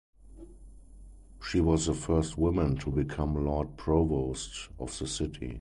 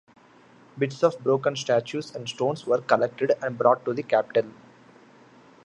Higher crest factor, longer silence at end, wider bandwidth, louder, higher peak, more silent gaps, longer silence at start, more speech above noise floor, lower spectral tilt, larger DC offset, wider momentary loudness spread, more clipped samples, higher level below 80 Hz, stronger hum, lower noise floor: about the same, 18 dB vs 22 dB; second, 0 s vs 1.15 s; about the same, 11.5 kHz vs 10.5 kHz; second, -30 LUFS vs -25 LUFS; second, -12 dBFS vs -4 dBFS; neither; second, 0.25 s vs 0.75 s; second, 21 dB vs 30 dB; about the same, -6 dB/octave vs -5.5 dB/octave; neither; about the same, 10 LU vs 8 LU; neither; first, -40 dBFS vs -74 dBFS; neither; second, -50 dBFS vs -54 dBFS